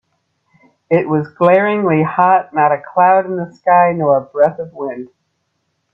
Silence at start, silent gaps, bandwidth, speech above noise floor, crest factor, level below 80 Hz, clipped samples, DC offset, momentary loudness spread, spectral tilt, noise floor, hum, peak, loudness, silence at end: 0.9 s; none; 5.8 kHz; 54 dB; 14 dB; -62 dBFS; under 0.1%; under 0.1%; 12 LU; -9.5 dB/octave; -68 dBFS; none; 0 dBFS; -14 LUFS; 0.9 s